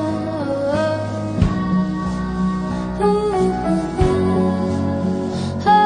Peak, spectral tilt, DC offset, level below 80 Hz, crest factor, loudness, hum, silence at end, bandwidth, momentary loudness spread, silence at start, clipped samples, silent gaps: -2 dBFS; -7.5 dB/octave; under 0.1%; -34 dBFS; 16 dB; -20 LUFS; none; 0 s; 10 kHz; 6 LU; 0 s; under 0.1%; none